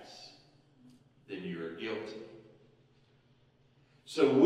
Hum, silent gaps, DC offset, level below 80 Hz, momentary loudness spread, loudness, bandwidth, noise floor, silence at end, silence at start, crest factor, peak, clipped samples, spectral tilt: none; none; under 0.1%; -80 dBFS; 26 LU; -37 LUFS; 11 kHz; -67 dBFS; 0 s; 0 s; 22 dB; -14 dBFS; under 0.1%; -6 dB/octave